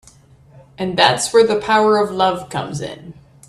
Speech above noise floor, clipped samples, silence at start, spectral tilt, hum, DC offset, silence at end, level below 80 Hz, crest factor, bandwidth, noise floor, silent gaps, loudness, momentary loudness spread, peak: 31 dB; under 0.1%; 0.8 s; -3.5 dB/octave; none; under 0.1%; 0.35 s; -54 dBFS; 18 dB; 13 kHz; -47 dBFS; none; -16 LUFS; 14 LU; 0 dBFS